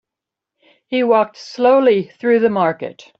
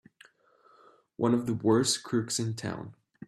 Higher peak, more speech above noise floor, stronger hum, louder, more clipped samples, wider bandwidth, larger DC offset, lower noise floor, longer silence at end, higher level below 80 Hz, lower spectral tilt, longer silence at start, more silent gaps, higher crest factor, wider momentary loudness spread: first, -2 dBFS vs -12 dBFS; first, 69 dB vs 35 dB; neither; first, -16 LUFS vs -29 LUFS; neither; second, 7 kHz vs 15 kHz; neither; first, -85 dBFS vs -63 dBFS; first, 0.25 s vs 0 s; about the same, -66 dBFS vs -68 dBFS; first, -6.5 dB/octave vs -4.5 dB/octave; second, 0.9 s vs 1.2 s; neither; about the same, 14 dB vs 18 dB; second, 10 LU vs 13 LU